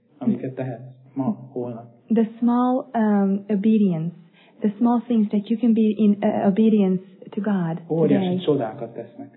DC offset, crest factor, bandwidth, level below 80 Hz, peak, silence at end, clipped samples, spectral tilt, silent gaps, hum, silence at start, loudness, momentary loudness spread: under 0.1%; 14 dB; 4 kHz; -78 dBFS; -8 dBFS; 0.1 s; under 0.1%; -12.5 dB/octave; none; none; 0.2 s; -22 LUFS; 14 LU